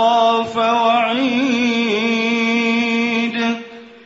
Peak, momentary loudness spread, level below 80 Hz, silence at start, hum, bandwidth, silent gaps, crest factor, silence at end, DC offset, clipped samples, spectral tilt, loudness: -4 dBFS; 5 LU; -62 dBFS; 0 s; none; 7.8 kHz; none; 14 dB; 0.1 s; under 0.1%; under 0.1%; -4 dB/octave; -16 LUFS